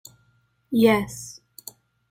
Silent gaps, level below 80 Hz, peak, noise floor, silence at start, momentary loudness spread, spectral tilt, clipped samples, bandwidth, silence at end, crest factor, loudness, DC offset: none; -58 dBFS; -6 dBFS; -65 dBFS; 0.7 s; 23 LU; -5 dB/octave; under 0.1%; 16 kHz; 0.8 s; 20 dB; -21 LUFS; under 0.1%